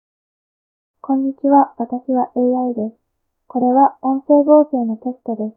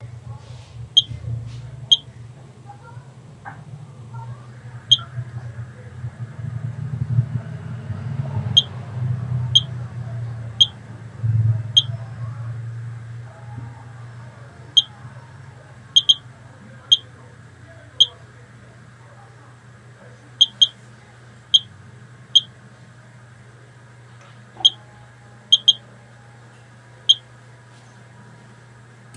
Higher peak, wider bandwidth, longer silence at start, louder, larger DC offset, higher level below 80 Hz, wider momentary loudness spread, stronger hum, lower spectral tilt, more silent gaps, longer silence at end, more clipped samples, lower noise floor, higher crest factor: about the same, 0 dBFS vs 0 dBFS; second, 1.9 kHz vs 10.5 kHz; first, 1.05 s vs 0 s; about the same, -17 LUFS vs -18 LUFS; neither; second, -70 dBFS vs -56 dBFS; second, 13 LU vs 23 LU; neither; first, -14.5 dB/octave vs -3 dB/octave; neither; about the same, 0.05 s vs 0 s; neither; about the same, -48 dBFS vs -45 dBFS; second, 18 dB vs 24 dB